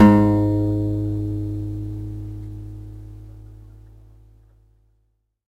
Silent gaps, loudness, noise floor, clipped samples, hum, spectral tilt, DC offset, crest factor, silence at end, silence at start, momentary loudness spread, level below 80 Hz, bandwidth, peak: none; -22 LUFS; -68 dBFS; under 0.1%; none; -9.5 dB/octave; under 0.1%; 22 dB; 1.85 s; 0 s; 24 LU; -38 dBFS; 8.4 kHz; 0 dBFS